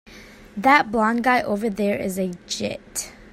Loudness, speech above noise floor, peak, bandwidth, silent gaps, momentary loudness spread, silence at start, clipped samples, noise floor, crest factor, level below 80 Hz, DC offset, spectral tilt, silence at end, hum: -21 LUFS; 23 dB; -2 dBFS; 16 kHz; none; 13 LU; 0.1 s; under 0.1%; -44 dBFS; 22 dB; -52 dBFS; under 0.1%; -4 dB/octave; 0.05 s; none